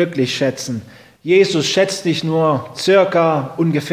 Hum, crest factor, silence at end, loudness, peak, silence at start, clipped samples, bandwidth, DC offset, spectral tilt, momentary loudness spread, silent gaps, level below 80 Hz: none; 16 dB; 0 s; -16 LUFS; 0 dBFS; 0 s; under 0.1%; 15.5 kHz; under 0.1%; -5 dB/octave; 10 LU; none; -58 dBFS